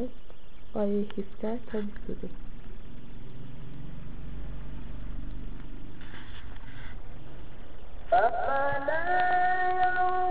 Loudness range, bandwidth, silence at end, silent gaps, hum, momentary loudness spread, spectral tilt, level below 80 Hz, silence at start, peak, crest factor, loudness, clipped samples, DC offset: 16 LU; 4.8 kHz; 0 s; none; none; 22 LU; -4.5 dB/octave; -42 dBFS; 0 s; -12 dBFS; 18 dB; -29 LUFS; under 0.1%; 4%